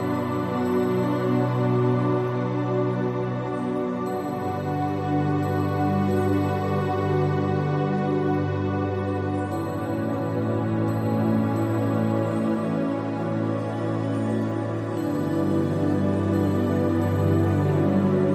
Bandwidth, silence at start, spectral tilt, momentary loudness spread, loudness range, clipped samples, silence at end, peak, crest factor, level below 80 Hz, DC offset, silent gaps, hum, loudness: 13 kHz; 0 s; -8.5 dB/octave; 5 LU; 2 LU; under 0.1%; 0 s; -10 dBFS; 14 dB; -60 dBFS; under 0.1%; none; none; -24 LUFS